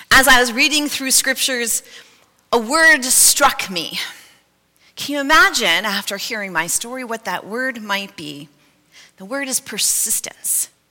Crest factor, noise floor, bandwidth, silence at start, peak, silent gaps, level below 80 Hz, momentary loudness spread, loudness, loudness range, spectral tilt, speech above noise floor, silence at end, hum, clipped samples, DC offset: 18 dB; -58 dBFS; 17 kHz; 0 s; 0 dBFS; none; -44 dBFS; 15 LU; -15 LUFS; 9 LU; -0.5 dB/octave; 40 dB; 0.25 s; none; under 0.1%; under 0.1%